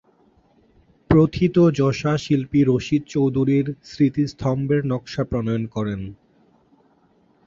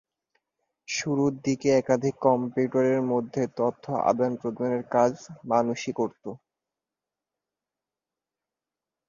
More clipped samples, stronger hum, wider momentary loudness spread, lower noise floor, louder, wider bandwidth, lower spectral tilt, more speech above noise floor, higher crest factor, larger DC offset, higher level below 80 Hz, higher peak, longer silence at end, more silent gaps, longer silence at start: neither; neither; about the same, 9 LU vs 7 LU; second, -59 dBFS vs -89 dBFS; first, -21 LUFS vs -26 LUFS; about the same, 7.6 kHz vs 7.4 kHz; first, -8 dB/octave vs -6 dB/octave; second, 39 dB vs 64 dB; about the same, 18 dB vs 20 dB; neither; first, -44 dBFS vs -68 dBFS; first, -2 dBFS vs -8 dBFS; second, 1.35 s vs 2.7 s; neither; first, 1.1 s vs 0.9 s